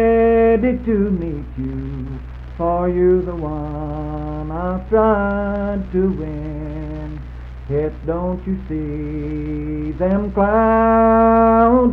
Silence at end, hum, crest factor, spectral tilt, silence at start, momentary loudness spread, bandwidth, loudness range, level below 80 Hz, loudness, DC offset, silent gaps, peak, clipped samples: 0 s; none; 14 dB; -11 dB/octave; 0 s; 15 LU; 4.7 kHz; 8 LU; -30 dBFS; -18 LUFS; under 0.1%; none; -2 dBFS; under 0.1%